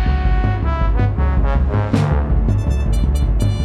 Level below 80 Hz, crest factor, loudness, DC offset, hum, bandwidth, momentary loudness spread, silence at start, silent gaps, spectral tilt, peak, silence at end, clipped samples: -16 dBFS; 14 dB; -18 LUFS; under 0.1%; none; 11 kHz; 2 LU; 0 s; none; -8 dB/octave; -2 dBFS; 0 s; under 0.1%